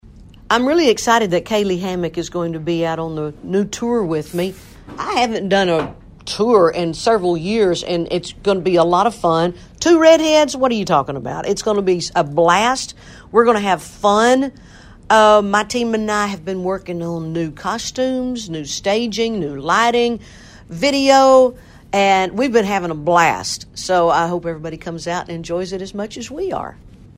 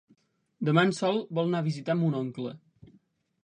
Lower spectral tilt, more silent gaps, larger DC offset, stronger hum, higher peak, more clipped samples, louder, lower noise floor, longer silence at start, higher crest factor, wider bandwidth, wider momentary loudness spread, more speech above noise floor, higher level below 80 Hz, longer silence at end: second, -4.5 dB/octave vs -6.5 dB/octave; neither; neither; neither; first, 0 dBFS vs -8 dBFS; neither; first, -17 LUFS vs -28 LUFS; second, -41 dBFS vs -65 dBFS; second, 0.15 s vs 0.6 s; second, 16 dB vs 22 dB; first, 16 kHz vs 10 kHz; about the same, 12 LU vs 11 LU; second, 25 dB vs 38 dB; first, -46 dBFS vs -72 dBFS; second, 0.3 s vs 0.9 s